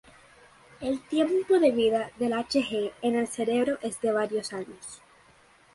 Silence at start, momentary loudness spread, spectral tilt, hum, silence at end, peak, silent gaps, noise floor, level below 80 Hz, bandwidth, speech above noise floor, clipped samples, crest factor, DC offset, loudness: 0.8 s; 14 LU; -4 dB/octave; none; 0.8 s; -10 dBFS; none; -58 dBFS; -64 dBFS; 11.5 kHz; 32 dB; under 0.1%; 18 dB; under 0.1%; -27 LUFS